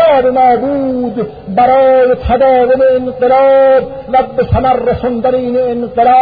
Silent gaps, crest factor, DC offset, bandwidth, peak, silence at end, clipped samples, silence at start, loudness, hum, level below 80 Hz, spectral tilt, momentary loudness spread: none; 10 dB; 0.1%; 4.9 kHz; 0 dBFS; 0 s; under 0.1%; 0 s; -10 LUFS; none; -30 dBFS; -10 dB/octave; 7 LU